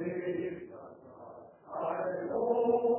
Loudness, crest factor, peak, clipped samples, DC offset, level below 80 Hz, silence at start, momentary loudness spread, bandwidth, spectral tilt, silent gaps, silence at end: -33 LUFS; 16 dB; -18 dBFS; under 0.1%; under 0.1%; -72 dBFS; 0 s; 22 LU; 3.1 kHz; -7 dB/octave; none; 0 s